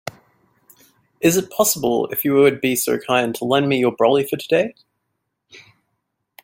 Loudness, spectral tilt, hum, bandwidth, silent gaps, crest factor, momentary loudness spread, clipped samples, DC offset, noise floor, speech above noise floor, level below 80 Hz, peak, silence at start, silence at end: -18 LUFS; -4 dB/octave; none; 17 kHz; none; 18 dB; 5 LU; under 0.1%; under 0.1%; -75 dBFS; 57 dB; -60 dBFS; -2 dBFS; 0.05 s; 0.85 s